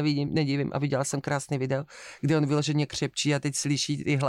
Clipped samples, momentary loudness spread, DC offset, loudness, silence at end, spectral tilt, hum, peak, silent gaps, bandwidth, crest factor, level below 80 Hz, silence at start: under 0.1%; 5 LU; under 0.1%; -27 LUFS; 0 s; -5 dB/octave; none; -12 dBFS; none; 13 kHz; 14 dB; -60 dBFS; 0 s